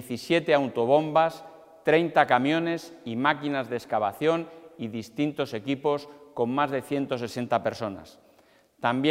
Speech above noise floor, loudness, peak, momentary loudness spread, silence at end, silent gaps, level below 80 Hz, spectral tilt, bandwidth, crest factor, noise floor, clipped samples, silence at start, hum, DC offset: 34 dB; -26 LUFS; -4 dBFS; 13 LU; 0 s; none; -70 dBFS; -6 dB/octave; 16 kHz; 22 dB; -60 dBFS; under 0.1%; 0 s; none; under 0.1%